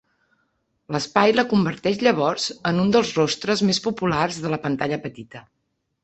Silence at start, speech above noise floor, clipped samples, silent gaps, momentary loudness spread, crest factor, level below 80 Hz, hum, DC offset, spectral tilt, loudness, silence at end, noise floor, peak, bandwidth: 0.9 s; 49 dB; under 0.1%; none; 10 LU; 20 dB; -56 dBFS; none; under 0.1%; -5 dB/octave; -21 LUFS; 0.65 s; -70 dBFS; -2 dBFS; 8.4 kHz